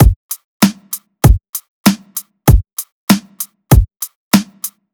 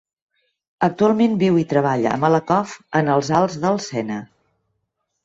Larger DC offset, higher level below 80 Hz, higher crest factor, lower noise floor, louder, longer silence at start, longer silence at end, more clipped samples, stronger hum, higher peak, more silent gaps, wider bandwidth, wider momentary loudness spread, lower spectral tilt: neither; first, -20 dBFS vs -58 dBFS; about the same, 14 dB vs 16 dB; second, -30 dBFS vs -74 dBFS; first, -14 LUFS vs -19 LUFS; second, 0 s vs 0.8 s; second, 0.25 s vs 1 s; neither; neither; first, 0 dBFS vs -4 dBFS; first, 0.16-0.29 s, 0.44-0.60 s, 1.49-1.53 s, 1.68-1.84 s, 2.73-2.77 s, 2.92-3.07 s, 4.16-4.31 s vs none; first, over 20 kHz vs 7.8 kHz; first, 14 LU vs 7 LU; about the same, -5.5 dB/octave vs -6.5 dB/octave